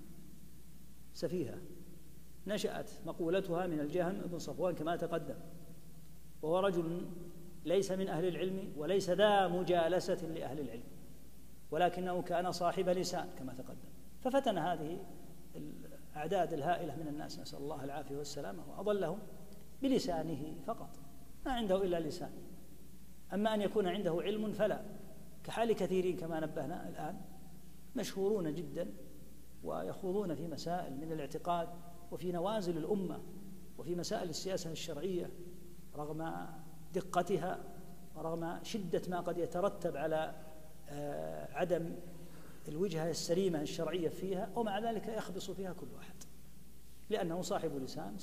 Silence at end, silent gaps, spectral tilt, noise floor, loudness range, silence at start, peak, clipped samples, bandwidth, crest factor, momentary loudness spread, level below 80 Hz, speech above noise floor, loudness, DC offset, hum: 0 s; none; -5.5 dB/octave; -59 dBFS; 6 LU; 0 s; -18 dBFS; under 0.1%; 15 kHz; 20 dB; 20 LU; -62 dBFS; 21 dB; -38 LUFS; 0.5%; none